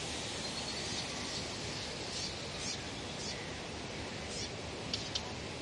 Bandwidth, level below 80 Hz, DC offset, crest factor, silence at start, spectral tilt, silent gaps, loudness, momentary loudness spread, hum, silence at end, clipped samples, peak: 11.5 kHz; -56 dBFS; under 0.1%; 20 dB; 0 s; -2.5 dB/octave; none; -39 LUFS; 5 LU; none; 0 s; under 0.1%; -20 dBFS